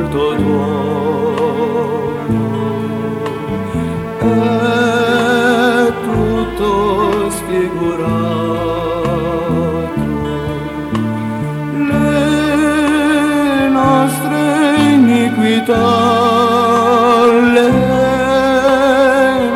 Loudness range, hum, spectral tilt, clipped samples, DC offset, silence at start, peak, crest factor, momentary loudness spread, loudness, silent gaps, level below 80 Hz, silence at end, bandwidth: 6 LU; none; -6 dB/octave; under 0.1%; under 0.1%; 0 s; 0 dBFS; 12 dB; 9 LU; -13 LUFS; none; -36 dBFS; 0 s; 16.5 kHz